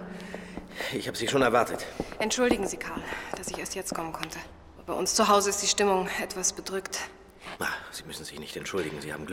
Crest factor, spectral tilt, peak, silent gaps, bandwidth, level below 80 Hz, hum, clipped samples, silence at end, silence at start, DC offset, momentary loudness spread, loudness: 22 dB; -2.5 dB/octave; -8 dBFS; none; 17 kHz; -54 dBFS; none; under 0.1%; 0 s; 0 s; under 0.1%; 17 LU; -29 LUFS